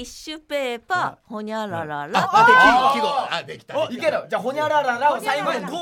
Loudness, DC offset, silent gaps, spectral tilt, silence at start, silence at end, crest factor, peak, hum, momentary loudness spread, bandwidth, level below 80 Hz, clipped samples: -20 LUFS; under 0.1%; none; -3.5 dB/octave; 0 s; 0 s; 18 dB; -2 dBFS; none; 15 LU; 17.5 kHz; -56 dBFS; under 0.1%